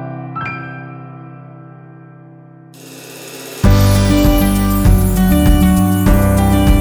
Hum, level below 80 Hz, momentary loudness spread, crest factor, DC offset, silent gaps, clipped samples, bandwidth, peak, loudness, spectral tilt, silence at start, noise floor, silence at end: none; -18 dBFS; 21 LU; 14 dB; under 0.1%; none; under 0.1%; over 20 kHz; 0 dBFS; -13 LUFS; -6.5 dB/octave; 0 s; -39 dBFS; 0 s